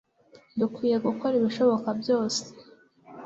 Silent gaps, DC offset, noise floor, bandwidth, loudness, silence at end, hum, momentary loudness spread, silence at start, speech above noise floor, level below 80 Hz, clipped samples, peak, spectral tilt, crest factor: none; under 0.1%; -57 dBFS; 8 kHz; -26 LUFS; 0 s; none; 8 LU; 0.55 s; 32 dB; -70 dBFS; under 0.1%; -10 dBFS; -5 dB/octave; 16 dB